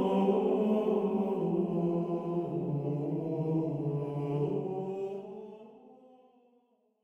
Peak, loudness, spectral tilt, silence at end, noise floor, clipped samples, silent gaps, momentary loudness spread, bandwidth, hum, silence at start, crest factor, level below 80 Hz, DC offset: -16 dBFS; -32 LUFS; -10 dB/octave; 1.1 s; -70 dBFS; under 0.1%; none; 10 LU; 8 kHz; none; 0 s; 16 dB; -72 dBFS; under 0.1%